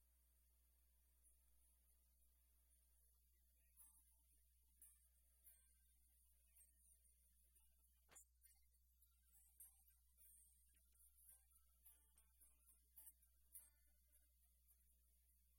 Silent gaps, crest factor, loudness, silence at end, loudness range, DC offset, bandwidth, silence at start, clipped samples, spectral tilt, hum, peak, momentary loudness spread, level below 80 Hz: none; 30 dB; -67 LUFS; 0 s; 1 LU; under 0.1%; 16.5 kHz; 0 s; under 0.1%; -1.5 dB/octave; none; -44 dBFS; 5 LU; -82 dBFS